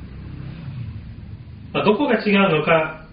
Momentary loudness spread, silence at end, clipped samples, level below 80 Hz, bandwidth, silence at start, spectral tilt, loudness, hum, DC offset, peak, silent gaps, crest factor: 21 LU; 0 s; under 0.1%; -44 dBFS; 5.2 kHz; 0 s; -4.5 dB/octave; -18 LUFS; none; under 0.1%; -2 dBFS; none; 18 dB